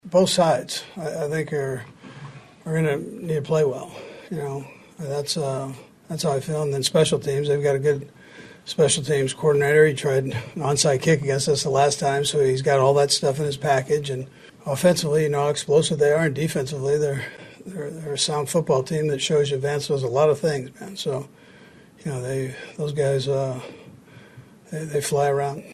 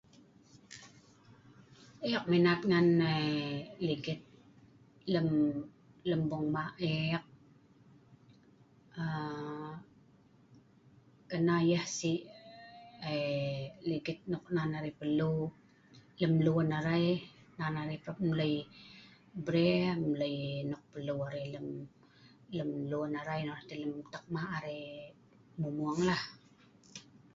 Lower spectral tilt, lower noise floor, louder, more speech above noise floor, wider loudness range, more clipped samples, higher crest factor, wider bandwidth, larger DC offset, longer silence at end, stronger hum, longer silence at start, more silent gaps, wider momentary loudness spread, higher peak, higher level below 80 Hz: second, -4.5 dB/octave vs -6.5 dB/octave; second, -49 dBFS vs -64 dBFS; first, -22 LUFS vs -34 LUFS; about the same, 27 dB vs 30 dB; about the same, 7 LU vs 8 LU; neither; about the same, 18 dB vs 20 dB; first, 13 kHz vs 7.8 kHz; neither; second, 0 s vs 0.35 s; neither; second, 0.05 s vs 0.7 s; neither; second, 16 LU vs 22 LU; first, -4 dBFS vs -16 dBFS; first, -58 dBFS vs -68 dBFS